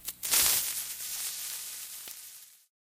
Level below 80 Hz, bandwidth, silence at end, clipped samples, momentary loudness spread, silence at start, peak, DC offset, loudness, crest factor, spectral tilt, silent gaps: -64 dBFS; 17 kHz; 0.25 s; under 0.1%; 20 LU; 0 s; -4 dBFS; under 0.1%; -29 LUFS; 28 dB; 2 dB/octave; none